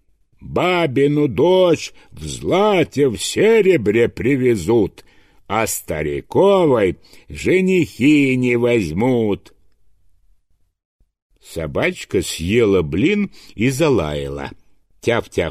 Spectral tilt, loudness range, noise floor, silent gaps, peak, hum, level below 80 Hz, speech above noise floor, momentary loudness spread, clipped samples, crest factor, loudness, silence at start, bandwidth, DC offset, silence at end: -5.5 dB/octave; 6 LU; -59 dBFS; 10.85-10.99 s, 11.22-11.30 s; -4 dBFS; none; -44 dBFS; 42 dB; 12 LU; under 0.1%; 14 dB; -17 LUFS; 0.4 s; 15.5 kHz; under 0.1%; 0 s